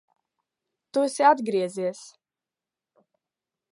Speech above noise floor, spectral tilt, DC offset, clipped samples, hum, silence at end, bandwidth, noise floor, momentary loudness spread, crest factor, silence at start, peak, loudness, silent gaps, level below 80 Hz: over 67 dB; -4.5 dB/octave; under 0.1%; under 0.1%; none; 1.65 s; 11.5 kHz; under -90 dBFS; 12 LU; 22 dB; 0.95 s; -6 dBFS; -24 LUFS; none; -86 dBFS